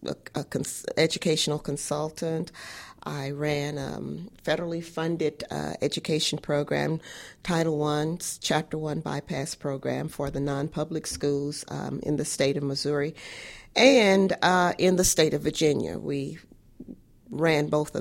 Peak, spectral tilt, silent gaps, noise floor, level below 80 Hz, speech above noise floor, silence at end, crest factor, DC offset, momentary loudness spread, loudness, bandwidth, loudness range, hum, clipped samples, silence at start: -4 dBFS; -4.5 dB/octave; none; -47 dBFS; -52 dBFS; 20 dB; 0 s; 22 dB; under 0.1%; 14 LU; -27 LUFS; 16.5 kHz; 8 LU; none; under 0.1%; 0 s